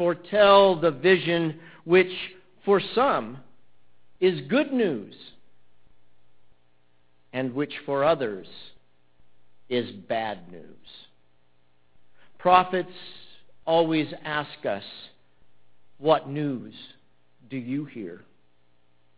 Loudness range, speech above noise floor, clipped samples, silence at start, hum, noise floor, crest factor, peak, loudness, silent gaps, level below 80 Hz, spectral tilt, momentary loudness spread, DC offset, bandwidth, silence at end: 9 LU; 44 dB; under 0.1%; 0 s; none; -68 dBFS; 24 dB; -4 dBFS; -24 LUFS; none; -64 dBFS; -9.5 dB/octave; 23 LU; 0.2%; 4 kHz; 1 s